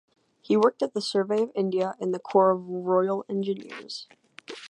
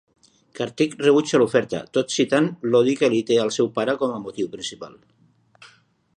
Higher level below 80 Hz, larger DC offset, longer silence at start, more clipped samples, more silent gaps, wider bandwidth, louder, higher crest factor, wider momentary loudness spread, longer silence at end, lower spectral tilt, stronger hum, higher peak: second, -80 dBFS vs -66 dBFS; neither; about the same, 0.5 s vs 0.55 s; neither; neither; about the same, 11 kHz vs 10.5 kHz; second, -26 LUFS vs -21 LUFS; about the same, 20 dB vs 18 dB; about the same, 15 LU vs 13 LU; second, 0.05 s vs 1.3 s; about the same, -6 dB/octave vs -5 dB/octave; neither; second, -8 dBFS vs -4 dBFS